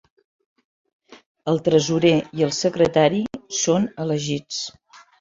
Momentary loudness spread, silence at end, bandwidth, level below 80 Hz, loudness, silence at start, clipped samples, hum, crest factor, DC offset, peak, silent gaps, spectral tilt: 11 LU; 0.5 s; 7.8 kHz; -58 dBFS; -21 LUFS; 1.1 s; under 0.1%; none; 20 dB; under 0.1%; -2 dBFS; 1.26-1.35 s; -5 dB/octave